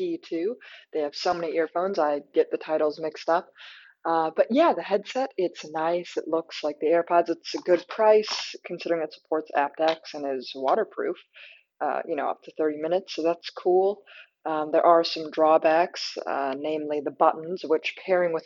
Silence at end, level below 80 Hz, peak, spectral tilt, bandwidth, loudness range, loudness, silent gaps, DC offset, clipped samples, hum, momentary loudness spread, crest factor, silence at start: 0.05 s; -78 dBFS; -4 dBFS; -4.5 dB/octave; 7.6 kHz; 5 LU; -26 LUFS; none; under 0.1%; under 0.1%; none; 11 LU; 20 dB; 0 s